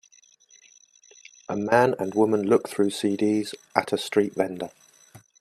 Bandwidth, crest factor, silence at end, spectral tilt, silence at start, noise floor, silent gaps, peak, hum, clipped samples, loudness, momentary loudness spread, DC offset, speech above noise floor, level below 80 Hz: 14 kHz; 24 dB; 0.2 s; -5.5 dB/octave; 1.5 s; -58 dBFS; none; -2 dBFS; none; under 0.1%; -24 LUFS; 11 LU; under 0.1%; 34 dB; -68 dBFS